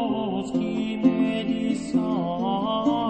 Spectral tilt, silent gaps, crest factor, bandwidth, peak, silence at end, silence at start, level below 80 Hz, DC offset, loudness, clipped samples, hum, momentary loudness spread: -6.5 dB/octave; none; 16 dB; 8.8 kHz; -8 dBFS; 0 s; 0 s; -56 dBFS; under 0.1%; -25 LUFS; under 0.1%; none; 5 LU